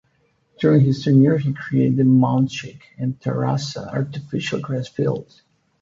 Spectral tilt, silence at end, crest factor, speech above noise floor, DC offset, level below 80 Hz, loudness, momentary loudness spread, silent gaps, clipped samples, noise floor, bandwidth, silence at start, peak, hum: -7.5 dB/octave; 0.6 s; 16 dB; 45 dB; under 0.1%; -56 dBFS; -20 LUFS; 11 LU; none; under 0.1%; -64 dBFS; 7.6 kHz; 0.6 s; -4 dBFS; none